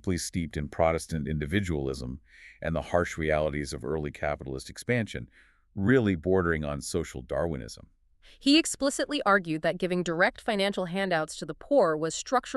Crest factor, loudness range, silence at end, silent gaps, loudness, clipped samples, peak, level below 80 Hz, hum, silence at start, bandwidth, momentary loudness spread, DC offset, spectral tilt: 20 dB; 4 LU; 0 s; none; -28 LUFS; under 0.1%; -10 dBFS; -46 dBFS; none; 0.05 s; 13.5 kHz; 13 LU; under 0.1%; -5 dB/octave